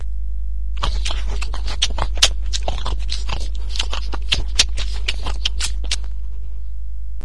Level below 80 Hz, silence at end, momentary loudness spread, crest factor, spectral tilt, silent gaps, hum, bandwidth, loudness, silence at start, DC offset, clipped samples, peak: -24 dBFS; 0 s; 15 LU; 22 dB; -1.5 dB/octave; none; none; 12 kHz; -23 LUFS; 0 s; 10%; under 0.1%; 0 dBFS